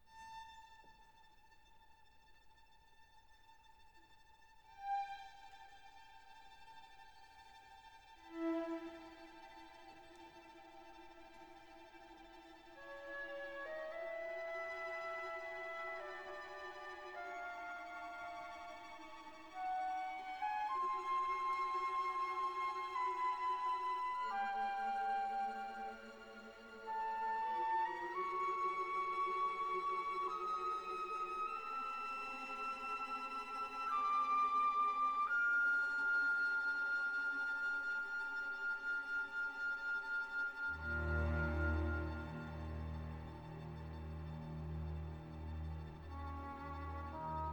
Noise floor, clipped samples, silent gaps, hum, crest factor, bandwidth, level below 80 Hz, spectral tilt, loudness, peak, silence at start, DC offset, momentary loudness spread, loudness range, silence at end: -67 dBFS; under 0.1%; none; none; 16 dB; 19 kHz; -56 dBFS; -6 dB/octave; -41 LUFS; -28 dBFS; 0 s; under 0.1%; 23 LU; 15 LU; 0 s